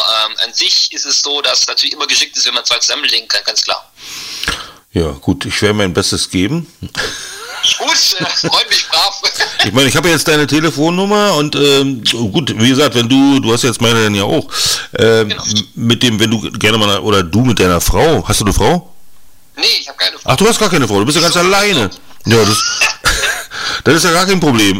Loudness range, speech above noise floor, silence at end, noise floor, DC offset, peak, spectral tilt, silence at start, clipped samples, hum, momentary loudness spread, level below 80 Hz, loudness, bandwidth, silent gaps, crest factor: 4 LU; 30 dB; 0 s; -43 dBFS; under 0.1%; 0 dBFS; -3.5 dB/octave; 0 s; under 0.1%; none; 9 LU; -32 dBFS; -11 LUFS; 16.5 kHz; none; 12 dB